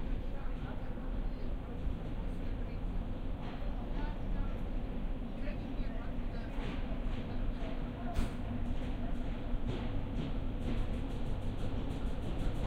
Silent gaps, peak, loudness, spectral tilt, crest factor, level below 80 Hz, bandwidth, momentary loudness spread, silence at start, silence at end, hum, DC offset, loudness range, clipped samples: none; -20 dBFS; -41 LUFS; -7.5 dB/octave; 16 dB; -38 dBFS; 8.6 kHz; 3 LU; 0 s; 0 s; none; under 0.1%; 2 LU; under 0.1%